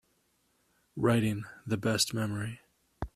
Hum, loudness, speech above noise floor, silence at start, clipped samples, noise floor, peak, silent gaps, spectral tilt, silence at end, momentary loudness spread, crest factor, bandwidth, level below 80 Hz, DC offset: none; -31 LUFS; 42 dB; 0.95 s; under 0.1%; -73 dBFS; -14 dBFS; none; -4.5 dB/octave; 0.05 s; 16 LU; 20 dB; 14.5 kHz; -54 dBFS; under 0.1%